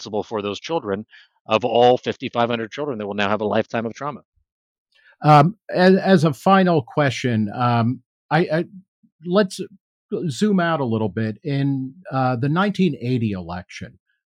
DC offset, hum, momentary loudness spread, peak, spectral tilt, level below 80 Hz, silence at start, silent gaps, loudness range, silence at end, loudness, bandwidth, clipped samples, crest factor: under 0.1%; none; 15 LU; -2 dBFS; -7 dB/octave; -66 dBFS; 0 s; 1.40-1.45 s, 4.25-4.32 s, 4.52-4.86 s, 8.06-8.29 s, 8.88-9.03 s, 9.12-9.19 s, 9.80-10.09 s; 6 LU; 0.4 s; -20 LUFS; 11.5 kHz; under 0.1%; 18 dB